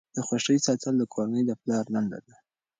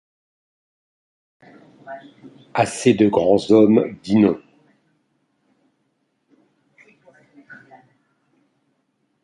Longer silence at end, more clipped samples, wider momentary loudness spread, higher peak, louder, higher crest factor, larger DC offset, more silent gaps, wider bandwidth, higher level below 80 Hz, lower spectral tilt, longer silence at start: second, 0.6 s vs 1.7 s; neither; second, 6 LU vs 25 LU; second, -12 dBFS vs -2 dBFS; second, -27 LUFS vs -17 LUFS; about the same, 16 dB vs 20 dB; neither; neither; second, 9.6 kHz vs 11.5 kHz; second, -70 dBFS vs -60 dBFS; second, -4.5 dB/octave vs -6.5 dB/octave; second, 0.15 s vs 1.85 s